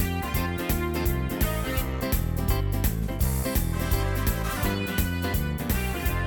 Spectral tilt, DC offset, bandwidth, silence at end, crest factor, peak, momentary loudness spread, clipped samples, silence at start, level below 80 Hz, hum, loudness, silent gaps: -5.5 dB/octave; under 0.1%; over 20 kHz; 0 s; 16 dB; -10 dBFS; 2 LU; under 0.1%; 0 s; -30 dBFS; none; -27 LUFS; none